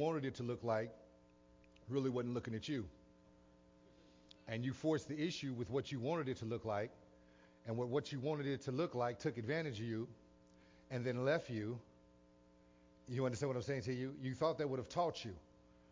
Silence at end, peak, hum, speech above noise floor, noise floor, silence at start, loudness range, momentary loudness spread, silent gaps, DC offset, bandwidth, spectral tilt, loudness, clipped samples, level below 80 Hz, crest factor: 0.5 s; -24 dBFS; none; 27 dB; -67 dBFS; 0 s; 3 LU; 9 LU; none; under 0.1%; 7.6 kHz; -6.5 dB/octave; -42 LUFS; under 0.1%; -70 dBFS; 20 dB